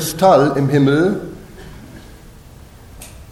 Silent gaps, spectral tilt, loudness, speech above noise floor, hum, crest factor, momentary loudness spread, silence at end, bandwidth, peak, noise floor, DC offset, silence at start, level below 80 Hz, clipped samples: none; -6 dB/octave; -14 LUFS; 27 dB; none; 16 dB; 26 LU; 0.1 s; 15.5 kHz; 0 dBFS; -40 dBFS; under 0.1%; 0 s; -42 dBFS; under 0.1%